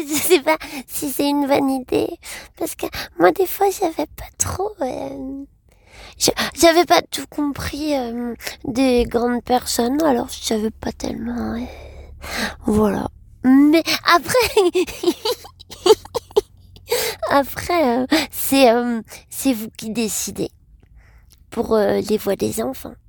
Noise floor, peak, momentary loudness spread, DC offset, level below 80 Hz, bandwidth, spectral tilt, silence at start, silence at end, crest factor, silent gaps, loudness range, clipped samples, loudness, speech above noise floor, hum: -49 dBFS; 0 dBFS; 13 LU; under 0.1%; -44 dBFS; 19 kHz; -3.5 dB/octave; 0 s; 0.15 s; 20 dB; none; 6 LU; under 0.1%; -19 LUFS; 30 dB; none